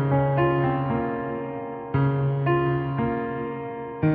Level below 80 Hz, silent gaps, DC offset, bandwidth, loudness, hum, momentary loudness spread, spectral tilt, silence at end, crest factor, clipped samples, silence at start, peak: -48 dBFS; none; under 0.1%; 3.8 kHz; -25 LUFS; none; 10 LU; -8 dB/octave; 0 s; 14 dB; under 0.1%; 0 s; -10 dBFS